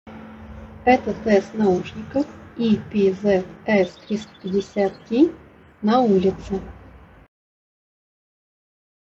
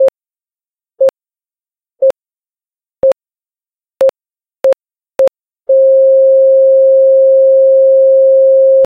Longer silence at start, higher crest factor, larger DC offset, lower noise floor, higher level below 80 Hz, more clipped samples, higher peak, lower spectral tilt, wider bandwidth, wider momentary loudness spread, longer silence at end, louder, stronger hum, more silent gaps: about the same, 0.05 s vs 0 s; first, 20 dB vs 8 dB; neither; second, -39 dBFS vs under -90 dBFS; first, -48 dBFS vs -60 dBFS; neither; about the same, -4 dBFS vs -2 dBFS; first, -7 dB/octave vs -4.5 dB/octave; first, 7.6 kHz vs 3.7 kHz; first, 12 LU vs 8 LU; first, 2.1 s vs 0 s; second, -21 LUFS vs -9 LUFS; neither; neither